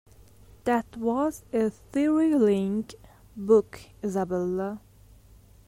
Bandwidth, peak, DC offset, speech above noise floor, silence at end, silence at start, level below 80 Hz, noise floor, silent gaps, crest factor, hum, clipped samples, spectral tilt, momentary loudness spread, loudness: 16 kHz; -8 dBFS; under 0.1%; 28 dB; 0.9 s; 0.65 s; -56 dBFS; -54 dBFS; none; 18 dB; none; under 0.1%; -7 dB/octave; 15 LU; -26 LUFS